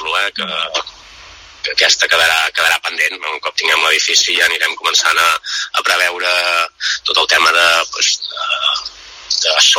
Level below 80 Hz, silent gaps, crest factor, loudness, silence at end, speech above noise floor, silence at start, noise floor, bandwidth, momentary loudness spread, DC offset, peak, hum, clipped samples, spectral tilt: -54 dBFS; none; 16 dB; -13 LUFS; 0 s; 23 dB; 0 s; -38 dBFS; over 20 kHz; 9 LU; under 0.1%; 0 dBFS; none; under 0.1%; 2 dB/octave